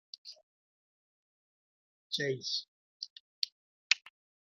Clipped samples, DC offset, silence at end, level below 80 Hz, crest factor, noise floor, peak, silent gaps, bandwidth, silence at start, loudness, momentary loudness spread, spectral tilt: under 0.1%; under 0.1%; 0.35 s; under -90 dBFS; 34 dB; under -90 dBFS; -6 dBFS; 0.43-2.10 s, 2.68-3.00 s, 3.10-3.42 s, 3.52-3.90 s; 12.5 kHz; 0.25 s; -35 LUFS; 17 LU; -2 dB/octave